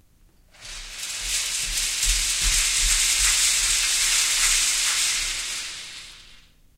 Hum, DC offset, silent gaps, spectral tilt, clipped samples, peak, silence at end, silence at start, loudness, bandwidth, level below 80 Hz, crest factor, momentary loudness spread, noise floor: none; under 0.1%; none; 2 dB/octave; under 0.1%; -6 dBFS; 0.4 s; 0.6 s; -20 LUFS; 16 kHz; -36 dBFS; 18 dB; 16 LU; -56 dBFS